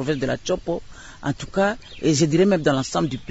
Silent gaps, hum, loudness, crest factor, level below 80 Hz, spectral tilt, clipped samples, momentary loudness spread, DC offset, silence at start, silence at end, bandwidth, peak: none; none; -22 LUFS; 18 dB; -46 dBFS; -5.5 dB/octave; under 0.1%; 12 LU; under 0.1%; 0 s; 0 s; 8 kHz; -4 dBFS